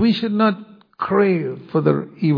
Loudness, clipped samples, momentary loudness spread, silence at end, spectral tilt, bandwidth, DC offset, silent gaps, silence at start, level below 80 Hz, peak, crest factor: -19 LUFS; under 0.1%; 7 LU; 0 s; -9.5 dB/octave; 5.2 kHz; under 0.1%; none; 0 s; -62 dBFS; -2 dBFS; 16 dB